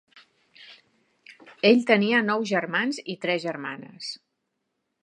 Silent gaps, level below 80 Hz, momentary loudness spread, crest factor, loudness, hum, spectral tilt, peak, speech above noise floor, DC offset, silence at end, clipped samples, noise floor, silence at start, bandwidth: none; -78 dBFS; 16 LU; 24 dB; -23 LUFS; none; -5 dB/octave; -4 dBFS; 55 dB; under 0.1%; 0.9 s; under 0.1%; -79 dBFS; 0.6 s; 10.5 kHz